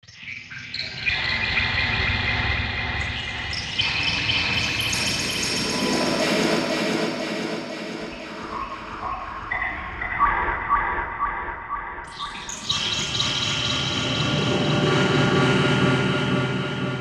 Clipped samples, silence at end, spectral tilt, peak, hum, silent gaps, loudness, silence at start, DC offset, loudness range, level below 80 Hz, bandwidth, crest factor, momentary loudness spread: under 0.1%; 0 s; -4 dB/octave; -8 dBFS; none; none; -23 LUFS; 0.1 s; under 0.1%; 5 LU; -40 dBFS; 15 kHz; 16 dB; 12 LU